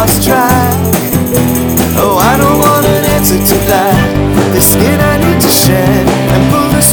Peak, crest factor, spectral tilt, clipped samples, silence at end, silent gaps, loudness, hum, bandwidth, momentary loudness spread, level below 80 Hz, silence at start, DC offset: 0 dBFS; 8 dB; -4.5 dB/octave; 0.6%; 0 s; none; -8 LUFS; none; over 20 kHz; 4 LU; -24 dBFS; 0 s; under 0.1%